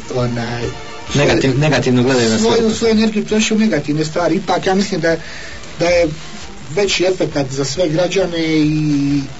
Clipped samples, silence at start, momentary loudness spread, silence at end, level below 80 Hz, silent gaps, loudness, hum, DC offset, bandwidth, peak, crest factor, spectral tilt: under 0.1%; 0 s; 10 LU; 0 s; -40 dBFS; none; -15 LUFS; none; 3%; 8 kHz; -2 dBFS; 12 dB; -5 dB/octave